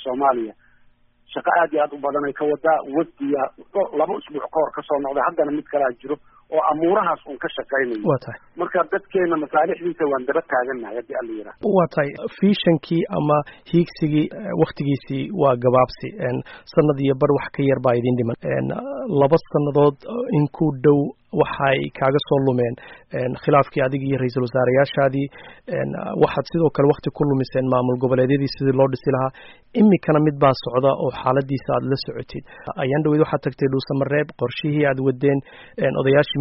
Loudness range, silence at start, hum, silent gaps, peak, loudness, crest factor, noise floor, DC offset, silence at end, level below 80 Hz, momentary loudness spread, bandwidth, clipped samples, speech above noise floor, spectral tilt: 3 LU; 0 s; none; none; -4 dBFS; -21 LUFS; 16 dB; -55 dBFS; under 0.1%; 0 s; -54 dBFS; 9 LU; 5.8 kHz; under 0.1%; 35 dB; -6 dB/octave